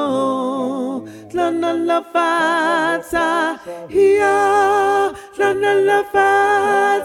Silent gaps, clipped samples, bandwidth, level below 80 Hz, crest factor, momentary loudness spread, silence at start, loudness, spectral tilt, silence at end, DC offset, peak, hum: none; under 0.1%; 14 kHz; -54 dBFS; 14 dB; 8 LU; 0 s; -16 LUFS; -4 dB/octave; 0 s; under 0.1%; -2 dBFS; none